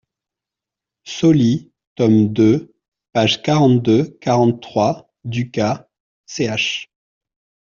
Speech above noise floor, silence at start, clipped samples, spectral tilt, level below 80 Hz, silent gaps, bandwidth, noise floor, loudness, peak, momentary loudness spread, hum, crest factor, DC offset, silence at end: 71 dB; 1.05 s; under 0.1%; -5.5 dB/octave; -56 dBFS; 1.87-1.96 s, 2.88-2.92 s, 6.00-6.24 s; 7.4 kHz; -86 dBFS; -17 LUFS; -4 dBFS; 12 LU; none; 16 dB; under 0.1%; 0.85 s